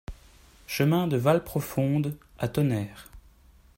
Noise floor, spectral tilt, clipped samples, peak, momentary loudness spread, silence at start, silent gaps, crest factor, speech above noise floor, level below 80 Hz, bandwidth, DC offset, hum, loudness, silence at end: -56 dBFS; -7 dB/octave; under 0.1%; -10 dBFS; 13 LU; 0.1 s; none; 18 dB; 31 dB; -52 dBFS; 16.5 kHz; under 0.1%; none; -27 LUFS; 0.6 s